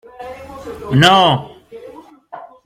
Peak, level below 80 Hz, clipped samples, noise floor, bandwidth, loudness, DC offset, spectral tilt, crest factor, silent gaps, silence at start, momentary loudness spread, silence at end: 0 dBFS; -50 dBFS; under 0.1%; -38 dBFS; 15.5 kHz; -12 LUFS; under 0.1%; -5 dB/octave; 18 dB; none; 0.2 s; 26 LU; 0.2 s